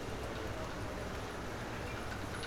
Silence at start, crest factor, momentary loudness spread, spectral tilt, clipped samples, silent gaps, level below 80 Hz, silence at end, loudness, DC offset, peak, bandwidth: 0 s; 14 dB; 1 LU; -5 dB/octave; under 0.1%; none; -50 dBFS; 0 s; -42 LUFS; under 0.1%; -26 dBFS; 18.5 kHz